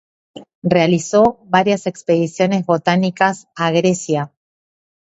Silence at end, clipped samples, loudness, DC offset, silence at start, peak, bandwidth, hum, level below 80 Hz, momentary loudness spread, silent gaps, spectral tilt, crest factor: 0.8 s; under 0.1%; -17 LUFS; under 0.1%; 0.35 s; 0 dBFS; 8.2 kHz; none; -56 dBFS; 7 LU; 0.55-0.62 s; -5.5 dB/octave; 18 dB